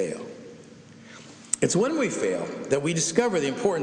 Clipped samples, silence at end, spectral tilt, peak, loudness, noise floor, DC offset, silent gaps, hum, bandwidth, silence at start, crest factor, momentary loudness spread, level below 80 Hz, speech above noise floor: under 0.1%; 0 s; -4 dB/octave; -4 dBFS; -25 LUFS; -47 dBFS; under 0.1%; none; none; 10.5 kHz; 0 s; 22 dB; 22 LU; -66 dBFS; 23 dB